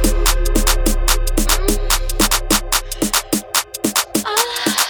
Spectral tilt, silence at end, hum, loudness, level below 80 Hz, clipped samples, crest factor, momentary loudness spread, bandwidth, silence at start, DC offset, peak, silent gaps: -2.5 dB/octave; 0 s; none; -17 LUFS; -20 dBFS; under 0.1%; 16 dB; 2 LU; over 20 kHz; 0 s; under 0.1%; 0 dBFS; none